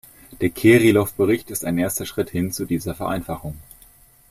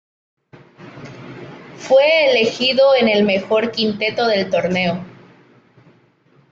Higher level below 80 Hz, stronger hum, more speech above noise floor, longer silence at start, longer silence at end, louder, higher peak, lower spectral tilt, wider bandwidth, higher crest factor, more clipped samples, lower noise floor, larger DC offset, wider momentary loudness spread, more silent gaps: first, -48 dBFS vs -60 dBFS; neither; second, 31 dB vs 39 dB; second, 0.3 s vs 0.8 s; second, 0.7 s vs 1.4 s; second, -20 LUFS vs -15 LUFS; about the same, -2 dBFS vs -4 dBFS; about the same, -5.5 dB/octave vs -5 dB/octave; first, 15.5 kHz vs 7.6 kHz; about the same, 18 dB vs 16 dB; neither; second, -51 dBFS vs -55 dBFS; neither; second, 15 LU vs 23 LU; neither